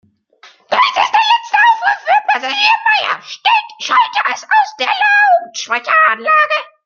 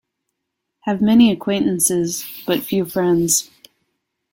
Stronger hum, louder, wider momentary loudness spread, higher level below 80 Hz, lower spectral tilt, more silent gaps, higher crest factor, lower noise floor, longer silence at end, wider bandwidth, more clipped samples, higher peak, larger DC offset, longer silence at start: neither; first, -12 LUFS vs -17 LUFS; second, 6 LU vs 11 LU; second, -76 dBFS vs -56 dBFS; second, 0.5 dB/octave vs -4 dB/octave; neither; about the same, 14 dB vs 16 dB; second, -46 dBFS vs -78 dBFS; second, 0.2 s vs 0.9 s; second, 7.2 kHz vs 17 kHz; neither; about the same, 0 dBFS vs -2 dBFS; neither; second, 0.45 s vs 0.85 s